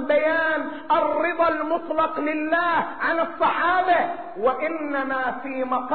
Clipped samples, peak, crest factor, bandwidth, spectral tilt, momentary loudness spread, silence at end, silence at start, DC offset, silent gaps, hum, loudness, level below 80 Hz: under 0.1%; -10 dBFS; 14 dB; 4.5 kHz; -1.5 dB/octave; 6 LU; 0 s; 0 s; 0.8%; none; none; -23 LUFS; -60 dBFS